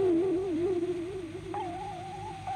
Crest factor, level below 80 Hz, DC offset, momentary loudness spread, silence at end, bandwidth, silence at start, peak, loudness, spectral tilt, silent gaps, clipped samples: 12 dB; -56 dBFS; under 0.1%; 11 LU; 0 s; 10 kHz; 0 s; -20 dBFS; -33 LUFS; -7 dB/octave; none; under 0.1%